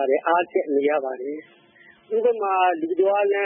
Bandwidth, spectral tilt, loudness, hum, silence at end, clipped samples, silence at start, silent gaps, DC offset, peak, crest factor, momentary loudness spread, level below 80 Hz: 3.6 kHz; -8.5 dB/octave; -22 LUFS; none; 0 s; under 0.1%; 0 s; none; under 0.1%; -8 dBFS; 14 dB; 10 LU; -84 dBFS